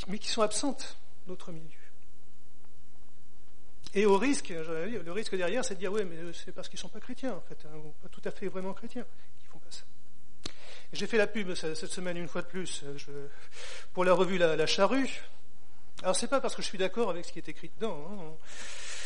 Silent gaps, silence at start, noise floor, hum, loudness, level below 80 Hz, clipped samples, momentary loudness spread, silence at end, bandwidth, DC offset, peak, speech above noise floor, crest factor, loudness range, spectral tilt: none; 0 s; -62 dBFS; none; -32 LUFS; -62 dBFS; under 0.1%; 21 LU; 0 s; 10.5 kHz; 4%; -12 dBFS; 29 dB; 22 dB; 12 LU; -4 dB/octave